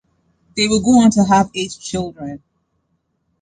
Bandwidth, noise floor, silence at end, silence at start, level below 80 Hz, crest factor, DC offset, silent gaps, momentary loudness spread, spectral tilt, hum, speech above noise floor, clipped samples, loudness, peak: 9.6 kHz; -68 dBFS; 1.05 s; 0.55 s; -46 dBFS; 16 dB; under 0.1%; none; 19 LU; -4.5 dB/octave; none; 53 dB; under 0.1%; -15 LUFS; -2 dBFS